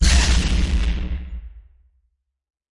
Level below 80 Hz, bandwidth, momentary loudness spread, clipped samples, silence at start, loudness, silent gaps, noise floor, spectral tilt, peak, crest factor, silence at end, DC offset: -22 dBFS; 11.5 kHz; 18 LU; under 0.1%; 0 s; -21 LUFS; none; -70 dBFS; -3.5 dB/octave; -4 dBFS; 16 dB; 1.15 s; under 0.1%